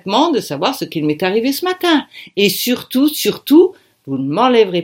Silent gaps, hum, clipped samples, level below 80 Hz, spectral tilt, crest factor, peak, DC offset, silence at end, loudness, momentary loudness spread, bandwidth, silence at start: none; none; under 0.1%; -66 dBFS; -4.5 dB/octave; 14 dB; 0 dBFS; under 0.1%; 0 s; -15 LUFS; 8 LU; 17 kHz; 0.05 s